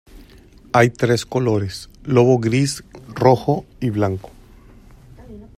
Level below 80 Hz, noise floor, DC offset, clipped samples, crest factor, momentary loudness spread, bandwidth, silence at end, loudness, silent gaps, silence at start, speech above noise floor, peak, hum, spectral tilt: -46 dBFS; -46 dBFS; under 0.1%; under 0.1%; 18 dB; 14 LU; 15 kHz; 0.15 s; -18 LUFS; none; 0.15 s; 28 dB; 0 dBFS; none; -6.5 dB/octave